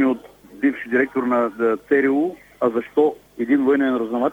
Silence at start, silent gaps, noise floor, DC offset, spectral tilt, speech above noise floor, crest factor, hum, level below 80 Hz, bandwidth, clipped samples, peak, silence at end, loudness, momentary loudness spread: 0 s; none; -39 dBFS; under 0.1%; -7 dB/octave; 20 dB; 16 dB; none; -60 dBFS; 7.6 kHz; under 0.1%; -4 dBFS; 0 s; -20 LUFS; 6 LU